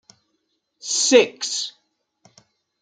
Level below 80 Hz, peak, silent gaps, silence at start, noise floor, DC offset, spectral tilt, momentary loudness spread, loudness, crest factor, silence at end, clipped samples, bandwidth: -80 dBFS; -2 dBFS; none; 0.85 s; -73 dBFS; under 0.1%; -0.5 dB/octave; 16 LU; -19 LUFS; 22 dB; 1.1 s; under 0.1%; 9.6 kHz